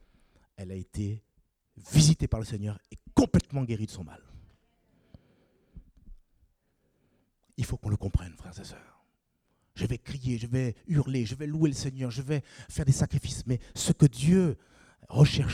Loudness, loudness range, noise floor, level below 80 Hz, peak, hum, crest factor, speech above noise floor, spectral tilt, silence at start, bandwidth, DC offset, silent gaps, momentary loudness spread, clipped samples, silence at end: -28 LUFS; 10 LU; -75 dBFS; -46 dBFS; -8 dBFS; none; 22 dB; 47 dB; -6 dB/octave; 0.6 s; 15 kHz; under 0.1%; none; 19 LU; under 0.1%; 0 s